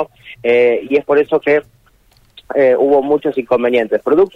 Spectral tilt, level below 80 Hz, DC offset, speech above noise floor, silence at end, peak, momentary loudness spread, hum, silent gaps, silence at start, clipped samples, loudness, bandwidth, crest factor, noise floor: -7 dB/octave; -54 dBFS; under 0.1%; 38 dB; 0.05 s; -2 dBFS; 5 LU; none; none; 0 s; under 0.1%; -14 LUFS; 5.6 kHz; 12 dB; -52 dBFS